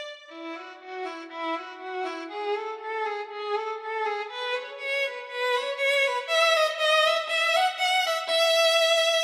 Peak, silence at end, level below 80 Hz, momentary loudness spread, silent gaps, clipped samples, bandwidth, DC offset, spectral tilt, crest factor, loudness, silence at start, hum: -10 dBFS; 0 s; under -90 dBFS; 15 LU; none; under 0.1%; 16.5 kHz; under 0.1%; 3 dB/octave; 16 dB; -25 LUFS; 0 s; none